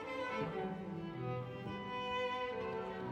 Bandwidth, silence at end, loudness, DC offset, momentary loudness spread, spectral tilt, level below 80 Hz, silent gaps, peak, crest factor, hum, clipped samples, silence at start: 10 kHz; 0 s; -41 LUFS; under 0.1%; 6 LU; -6.5 dB/octave; -66 dBFS; none; -26 dBFS; 14 dB; none; under 0.1%; 0 s